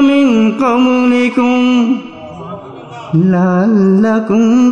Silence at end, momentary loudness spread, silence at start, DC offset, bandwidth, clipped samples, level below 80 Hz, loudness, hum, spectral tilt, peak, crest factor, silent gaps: 0 s; 19 LU; 0 s; under 0.1%; 7.4 kHz; under 0.1%; -54 dBFS; -11 LUFS; none; -7.5 dB/octave; 0 dBFS; 10 dB; none